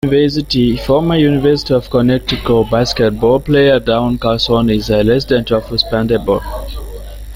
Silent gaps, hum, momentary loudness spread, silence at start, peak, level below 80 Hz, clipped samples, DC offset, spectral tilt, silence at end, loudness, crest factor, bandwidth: none; none; 6 LU; 0.05 s; -2 dBFS; -30 dBFS; under 0.1%; under 0.1%; -6.5 dB/octave; 0 s; -13 LUFS; 12 dB; 16.5 kHz